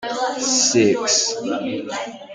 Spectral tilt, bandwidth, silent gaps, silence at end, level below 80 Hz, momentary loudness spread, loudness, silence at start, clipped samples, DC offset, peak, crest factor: -2 dB/octave; 11 kHz; none; 0 s; -64 dBFS; 11 LU; -18 LUFS; 0 s; under 0.1%; under 0.1%; -4 dBFS; 16 dB